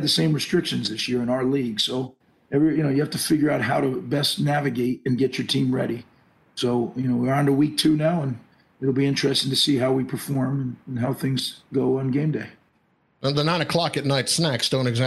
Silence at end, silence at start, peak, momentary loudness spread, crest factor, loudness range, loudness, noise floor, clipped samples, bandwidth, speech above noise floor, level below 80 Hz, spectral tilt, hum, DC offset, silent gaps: 0 s; 0 s; -8 dBFS; 8 LU; 16 dB; 3 LU; -23 LUFS; -65 dBFS; under 0.1%; 12.5 kHz; 43 dB; -58 dBFS; -5 dB/octave; none; under 0.1%; none